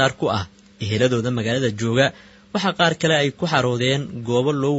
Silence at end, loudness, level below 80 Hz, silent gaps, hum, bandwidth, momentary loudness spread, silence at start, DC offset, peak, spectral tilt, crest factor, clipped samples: 0 s; -20 LUFS; -56 dBFS; none; none; 8 kHz; 7 LU; 0 s; under 0.1%; 0 dBFS; -5 dB/octave; 20 dB; under 0.1%